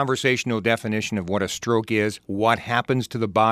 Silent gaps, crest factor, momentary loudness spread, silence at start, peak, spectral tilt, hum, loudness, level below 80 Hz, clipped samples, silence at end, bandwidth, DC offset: none; 18 dB; 5 LU; 0 s; -4 dBFS; -5 dB/octave; none; -23 LUFS; -58 dBFS; under 0.1%; 0 s; 15.5 kHz; under 0.1%